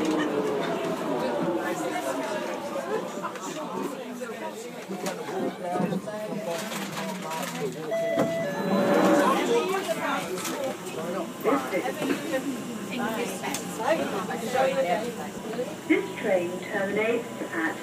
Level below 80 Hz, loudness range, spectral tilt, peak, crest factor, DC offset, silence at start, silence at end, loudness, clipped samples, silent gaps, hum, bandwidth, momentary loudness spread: -68 dBFS; 7 LU; -4.5 dB/octave; -8 dBFS; 20 dB; under 0.1%; 0 s; 0 s; -28 LUFS; under 0.1%; none; none; 15.5 kHz; 9 LU